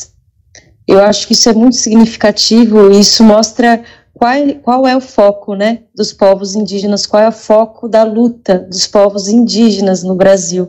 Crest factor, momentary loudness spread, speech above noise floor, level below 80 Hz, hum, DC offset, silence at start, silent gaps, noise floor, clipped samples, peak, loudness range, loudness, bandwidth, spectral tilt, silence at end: 8 dB; 9 LU; 40 dB; -44 dBFS; none; under 0.1%; 0 s; none; -49 dBFS; 3%; 0 dBFS; 4 LU; -9 LUFS; 18.5 kHz; -4 dB/octave; 0 s